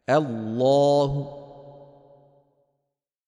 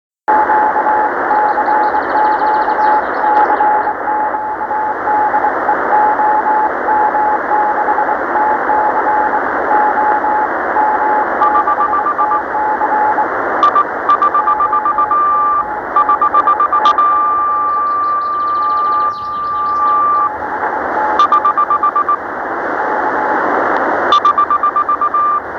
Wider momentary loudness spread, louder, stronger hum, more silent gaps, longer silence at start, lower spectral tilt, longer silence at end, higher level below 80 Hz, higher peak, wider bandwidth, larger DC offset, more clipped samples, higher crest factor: first, 22 LU vs 5 LU; second, -22 LUFS vs -13 LUFS; neither; neither; second, 0.1 s vs 0.3 s; first, -7 dB/octave vs -5 dB/octave; first, 1.55 s vs 0 s; about the same, -54 dBFS vs -50 dBFS; second, -8 dBFS vs 0 dBFS; first, 10.5 kHz vs 6.6 kHz; neither; neither; first, 18 dB vs 12 dB